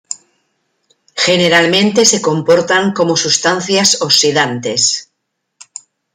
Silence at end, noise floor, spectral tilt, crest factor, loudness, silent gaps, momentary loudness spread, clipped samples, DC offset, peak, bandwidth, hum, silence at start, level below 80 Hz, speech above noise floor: 1.1 s; -72 dBFS; -2.5 dB/octave; 14 dB; -11 LUFS; none; 18 LU; under 0.1%; under 0.1%; 0 dBFS; 16.5 kHz; none; 0.1 s; -58 dBFS; 60 dB